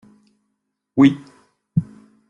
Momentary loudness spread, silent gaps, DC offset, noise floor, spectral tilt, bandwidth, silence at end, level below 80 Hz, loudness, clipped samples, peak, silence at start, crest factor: 18 LU; none; under 0.1%; -75 dBFS; -8 dB/octave; 7.2 kHz; 0.45 s; -60 dBFS; -19 LUFS; under 0.1%; -2 dBFS; 0.95 s; 20 dB